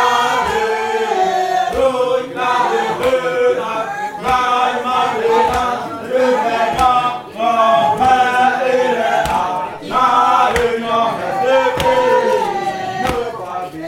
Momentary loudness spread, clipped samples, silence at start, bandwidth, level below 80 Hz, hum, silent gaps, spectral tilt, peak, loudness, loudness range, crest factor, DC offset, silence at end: 8 LU; under 0.1%; 0 s; 16.5 kHz; -42 dBFS; none; none; -4 dB/octave; 0 dBFS; -15 LUFS; 2 LU; 16 dB; under 0.1%; 0 s